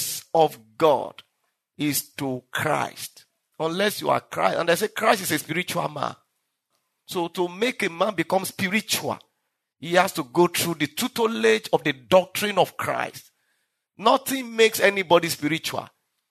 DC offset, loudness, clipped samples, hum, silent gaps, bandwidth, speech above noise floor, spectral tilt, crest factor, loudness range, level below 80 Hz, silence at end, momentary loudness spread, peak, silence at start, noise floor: under 0.1%; -23 LUFS; under 0.1%; none; none; 13.5 kHz; 54 dB; -3.5 dB/octave; 22 dB; 4 LU; -70 dBFS; 0.45 s; 10 LU; -4 dBFS; 0 s; -78 dBFS